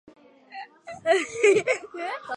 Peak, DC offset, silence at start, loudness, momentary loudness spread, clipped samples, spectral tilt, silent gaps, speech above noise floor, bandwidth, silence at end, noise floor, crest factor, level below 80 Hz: -8 dBFS; under 0.1%; 0.5 s; -24 LUFS; 21 LU; under 0.1%; -3 dB/octave; none; 20 dB; 11.5 kHz; 0 s; -43 dBFS; 18 dB; -72 dBFS